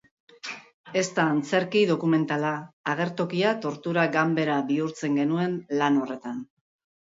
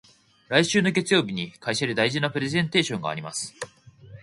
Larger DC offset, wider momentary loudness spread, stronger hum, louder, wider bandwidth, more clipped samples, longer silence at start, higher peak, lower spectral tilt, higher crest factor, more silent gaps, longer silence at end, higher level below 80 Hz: neither; about the same, 13 LU vs 11 LU; neither; about the same, -25 LUFS vs -24 LUFS; second, 8 kHz vs 11.5 kHz; neither; about the same, 0.45 s vs 0.5 s; second, -10 dBFS vs -4 dBFS; first, -5.5 dB/octave vs -4 dB/octave; second, 16 dB vs 22 dB; first, 0.74-0.84 s, 2.73-2.84 s vs none; first, 0.6 s vs 0 s; second, -74 dBFS vs -62 dBFS